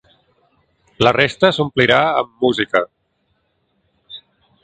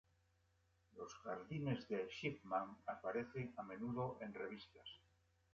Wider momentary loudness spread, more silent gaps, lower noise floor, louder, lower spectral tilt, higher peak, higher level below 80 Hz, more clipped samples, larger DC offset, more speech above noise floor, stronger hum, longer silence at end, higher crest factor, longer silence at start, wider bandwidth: first, 24 LU vs 13 LU; neither; second, -66 dBFS vs -79 dBFS; first, -16 LUFS vs -47 LUFS; about the same, -5.5 dB/octave vs -5 dB/octave; first, 0 dBFS vs -28 dBFS; first, -52 dBFS vs -76 dBFS; neither; neither; first, 51 dB vs 32 dB; neither; about the same, 0.45 s vs 0.55 s; about the same, 20 dB vs 20 dB; about the same, 1 s vs 0.95 s; first, 9.2 kHz vs 7.6 kHz